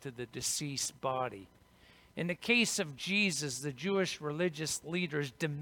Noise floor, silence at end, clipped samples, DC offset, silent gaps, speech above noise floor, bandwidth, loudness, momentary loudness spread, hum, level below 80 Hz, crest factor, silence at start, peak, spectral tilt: -62 dBFS; 0 s; under 0.1%; under 0.1%; none; 27 dB; 19 kHz; -34 LUFS; 10 LU; none; -70 dBFS; 20 dB; 0 s; -16 dBFS; -3.5 dB/octave